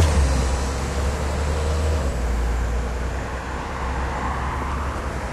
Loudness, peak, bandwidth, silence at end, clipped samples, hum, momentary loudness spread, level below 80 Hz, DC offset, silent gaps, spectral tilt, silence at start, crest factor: -25 LUFS; -6 dBFS; 12.5 kHz; 0 s; under 0.1%; none; 6 LU; -24 dBFS; under 0.1%; none; -5.5 dB/octave; 0 s; 16 dB